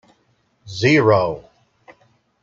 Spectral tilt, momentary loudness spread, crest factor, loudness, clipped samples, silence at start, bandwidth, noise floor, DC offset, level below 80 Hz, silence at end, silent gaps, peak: -6 dB/octave; 20 LU; 18 dB; -16 LUFS; under 0.1%; 0.65 s; 7.6 kHz; -63 dBFS; under 0.1%; -56 dBFS; 1.05 s; none; -2 dBFS